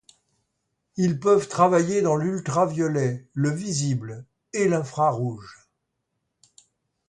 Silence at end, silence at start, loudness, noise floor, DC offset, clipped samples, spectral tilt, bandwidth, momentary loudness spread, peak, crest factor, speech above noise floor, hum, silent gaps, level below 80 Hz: 1.55 s; 0.95 s; -23 LUFS; -78 dBFS; under 0.1%; under 0.1%; -6 dB/octave; 11 kHz; 12 LU; -6 dBFS; 20 dB; 55 dB; none; none; -64 dBFS